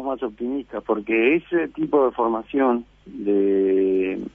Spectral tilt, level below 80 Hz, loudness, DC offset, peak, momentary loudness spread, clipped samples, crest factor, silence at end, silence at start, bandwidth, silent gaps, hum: -8.5 dB/octave; -56 dBFS; -22 LUFS; under 0.1%; -6 dBFS; 9 LU; under 0.1%; 16 dB; 0.05 s; 0 s; 3.7 kHz; none; none